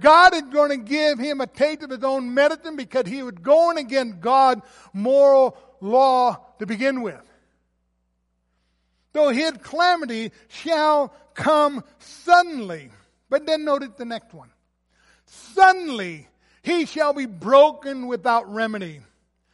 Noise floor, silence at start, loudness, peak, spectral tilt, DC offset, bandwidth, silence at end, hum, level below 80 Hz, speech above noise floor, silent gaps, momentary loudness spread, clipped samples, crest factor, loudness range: -71 dBFS; 0 s; -20 LUFS; -2 dBFS; -4 dB/octave; under 0.1%; 11.5 kHz; 0.55 s; none; -62 dBFS; 51 dB; none; 17 LU; under 0.1%; 18 dB; 6 LU